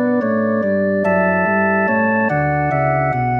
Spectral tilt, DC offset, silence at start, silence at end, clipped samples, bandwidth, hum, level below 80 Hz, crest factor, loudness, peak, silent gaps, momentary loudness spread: -10.5 dB/octave; under 0.1%; 0 s; 0 s; under 0.1%; 5.4 kHz; none; -46 dBFS; 12 dB; -16 LUFS; -4 dBFS; none; 2 LU